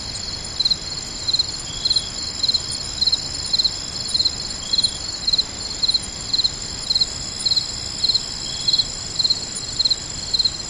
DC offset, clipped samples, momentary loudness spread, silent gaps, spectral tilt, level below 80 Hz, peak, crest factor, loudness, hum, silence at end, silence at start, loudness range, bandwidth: under 0.1%; under 0.1%; 7 LU; none; -0.5 dB/octave; -42 dBFS; -6 dBFS; 16 dB; -19 LUFS; none; 0 s; 0 s; 1 LU; 12 kHz